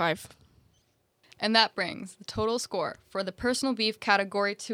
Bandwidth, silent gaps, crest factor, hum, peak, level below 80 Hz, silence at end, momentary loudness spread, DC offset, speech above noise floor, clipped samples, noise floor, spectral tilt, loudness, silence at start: 16 kHz; none; 24 dB; none; -6 dBFS; -60 dBFS; 0 s; 12 LU; under 0.1%; 41 dB; under 0.1%; -70 dBFS; -3 dB/octave; -28 LUFS; 0 s